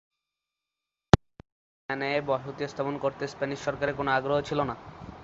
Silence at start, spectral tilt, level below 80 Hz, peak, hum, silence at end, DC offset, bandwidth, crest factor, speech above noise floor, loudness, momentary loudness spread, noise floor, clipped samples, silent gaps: 1.15 s; -6 dB/octave; -46 dBFS; -2 dBFS; none; 0 s; under 0.1%; 8 kHz; 28 dB; 58 dB; -29 LUFS; 11 LU; -88 dBFS; under 0.1%; 1.52-1.89 s